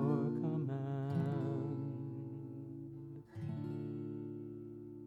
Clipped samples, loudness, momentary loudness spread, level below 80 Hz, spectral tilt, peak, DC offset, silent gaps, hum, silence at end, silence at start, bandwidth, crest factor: under 0.1%; -41 LUFS; 12 LU; -74 dBFS; -10.5 dB/octave; -22 dBFS; under 0.1%; none; none; 0 s; 0 s; 4.9 kHz; 18 dB